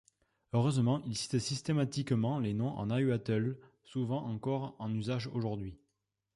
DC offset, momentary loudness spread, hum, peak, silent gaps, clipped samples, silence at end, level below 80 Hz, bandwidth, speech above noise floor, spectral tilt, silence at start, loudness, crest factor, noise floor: under 0.1%; 7 LU; none; -18 dBFS; none; under 0.1%; 0.6 s; -64 dBFS; 11.5 kHz; 51 dB; -6.5 dB/octave; 0.55 s; -34 LUFS; 16 dB; -84 dBFS